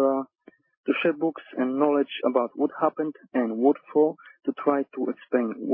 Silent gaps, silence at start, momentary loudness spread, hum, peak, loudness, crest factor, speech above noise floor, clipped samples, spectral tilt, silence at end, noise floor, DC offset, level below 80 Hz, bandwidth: 0.77-0.84 s; 0 s; 8 LU; none; -8 dBFS; -26 LUFS; 18 dB; 32 dB; under 0.1%; -10 dB/octave; 0 s; -57 dBFS; under 0.1%; -80 dBFS; 3.7 kHz